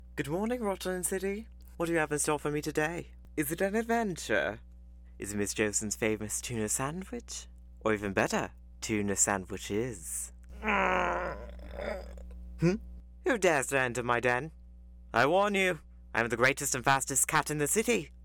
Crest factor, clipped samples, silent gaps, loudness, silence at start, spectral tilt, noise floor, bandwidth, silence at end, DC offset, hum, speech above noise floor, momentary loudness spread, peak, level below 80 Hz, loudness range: 20 dB; under 0.1%; none; -31 LUFS; 0 s; -3.5 dB/octave; -51 dBFS; 19 kHz; 0 s; under 0.1%; 60 Hz at -50 dBFS; 20 dB; 14 LU; -12 dBFS; -50 dBFS; 5 LU